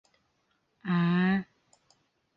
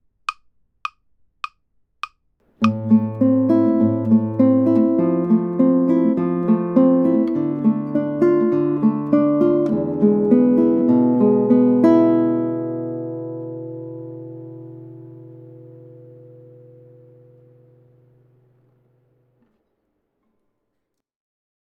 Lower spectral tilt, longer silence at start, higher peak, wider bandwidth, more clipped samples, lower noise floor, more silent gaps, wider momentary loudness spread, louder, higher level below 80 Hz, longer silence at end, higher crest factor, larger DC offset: second, -8.5 dB/octave vs -10 dB/octave; first, 0.85 s vs 0.3 s; second, -16 dBFS vs -2 dBFS; second, 5.2 kHz vs 6 kHz; neither; about the same, -74 dBFS vs -76 dBFS; neither; about the same, 17 LU vs 19 LU; second, -28 LUFS vs -17 LUFS; about the same, -68 dBFS vs -66 dBFS; second, 0.95 s vs 5.8 s; about the same, 16 dB vs 18 dB; neither